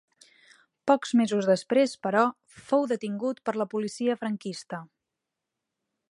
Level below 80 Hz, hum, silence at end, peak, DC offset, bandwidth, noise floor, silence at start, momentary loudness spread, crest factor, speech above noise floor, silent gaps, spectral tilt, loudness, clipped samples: -78 dBFS; none; 1.25 s; -6 dBFS; under 0.1%; 11.5 kHz; -86 dBFS; 0.85 s; 11 LU; 22 dB; 60 dB; none; -5.5 dB/octave; -27 LUFS; under 0.1%